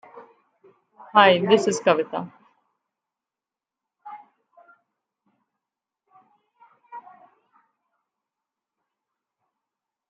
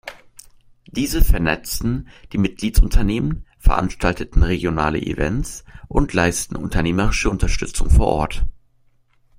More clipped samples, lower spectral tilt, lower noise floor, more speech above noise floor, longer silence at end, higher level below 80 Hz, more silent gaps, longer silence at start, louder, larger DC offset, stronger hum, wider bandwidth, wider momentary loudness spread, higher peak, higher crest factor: neither; second, -4 dB/octave vs -5.5 dB/octave; first, -90 dBFS vs -57 dBFS; first, 71 dB vs 40 dB; first, 3.1 s vs 0.85 s; second, -76 dBFS vs -22 dBFS; neither; about the same, 0.15 s vs 0.05 s; about the same, -19 LUFS vs -21 LUFS; neither; neither; second, 8.8 kHz vs 16 kHz; first, 27 LU vs 8 LU; about the same, -2 dBFS vs 0 dBFS; first, 26 dB vs 18 dB